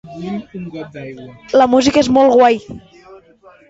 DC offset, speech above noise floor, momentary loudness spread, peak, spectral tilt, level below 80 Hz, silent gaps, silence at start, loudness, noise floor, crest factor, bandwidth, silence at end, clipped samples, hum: under 0.1%; 32 dB; 21 LU; 0 dBFS; -5 dB/octave; -48 dBFS; none; 0.05 s; -12 LUFS; -46 dBFS; 16 dB; 8 kHz; 0.55 s; under 0.1%; none